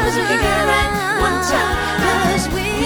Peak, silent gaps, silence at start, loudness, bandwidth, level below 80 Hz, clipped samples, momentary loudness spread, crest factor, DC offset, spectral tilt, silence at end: -2 dBFS; none; 0 s; -16 LUFS; 19.5 kHz; -30 dBFS; under 0.1%; 3 LU; 14 dB; under 0.1%; -4 dB/octave; 0 s